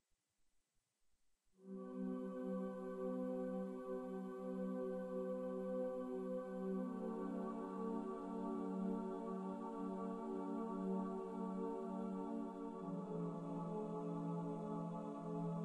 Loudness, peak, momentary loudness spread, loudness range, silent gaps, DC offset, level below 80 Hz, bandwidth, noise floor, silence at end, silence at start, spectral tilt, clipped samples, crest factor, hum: -46 LUFS; -32 dBFS; 3 LU; 2 LU; none; under 0.1%; -76 dBFS; 10.5 kHz; -82 dBFS; 0 s; 1.6 s; -9.5 dB/octave; under 0.1%; 14 dB; none